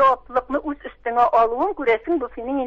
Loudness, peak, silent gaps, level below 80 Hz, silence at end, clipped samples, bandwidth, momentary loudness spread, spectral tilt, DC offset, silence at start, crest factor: -21 LUFS; -6 dBFS; none; -50 dBFS; 0 s; under 0.1%; 7 kHz; 9 LU; -6 dB/octave; under 0.1%; 0 s; 16 dB